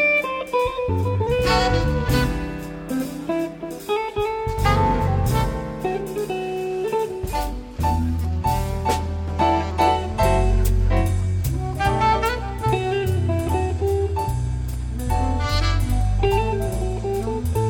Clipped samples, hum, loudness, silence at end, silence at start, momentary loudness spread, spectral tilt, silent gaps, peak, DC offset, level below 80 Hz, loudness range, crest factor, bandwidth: under 0.1%; none; -22 LUFS; 0 s; 0 s; 7 LU; -6 dB/octave; none; -4 dBFS; under 0.1%; -28 dBFS; 3 LU; 16 dB; 18 kHz